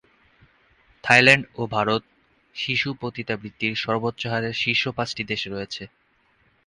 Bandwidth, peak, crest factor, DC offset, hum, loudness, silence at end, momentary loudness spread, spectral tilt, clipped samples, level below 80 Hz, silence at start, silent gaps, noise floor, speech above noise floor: 11.5 kHz; 0 dBFS; 24 dB; under 0.1%; none; -22 LUFS; 0.8 s; 16 LU; -4.5 dB/octave; under 0.1%; -58 dBFS; 1.05 s; none; -63 dBFS; 40 dB